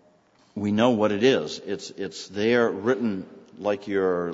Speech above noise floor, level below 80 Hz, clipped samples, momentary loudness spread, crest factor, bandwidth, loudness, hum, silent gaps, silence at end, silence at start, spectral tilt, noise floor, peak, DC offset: 36 dB; -66 dBFS; under 0.1%; 13 LU; 20 dB; 8 kHz; -25 LUFS; none; none; 0 s; 0.55 s; -5.5 dB/octave; -60 dBFS; -6 dBFS; under 0.1%